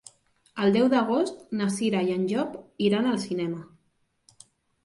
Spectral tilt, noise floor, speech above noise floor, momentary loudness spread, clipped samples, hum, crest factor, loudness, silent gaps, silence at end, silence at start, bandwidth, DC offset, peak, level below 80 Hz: -6 dB/octave; -71 dBFS; 46 dB; 10 LU; under 0.1%; none; 18 dB; -26 LUFS; none; 1.2 s; 0.55 s; 11.5 kHz; under 0.1%; -10 dBFS; -68 dBFS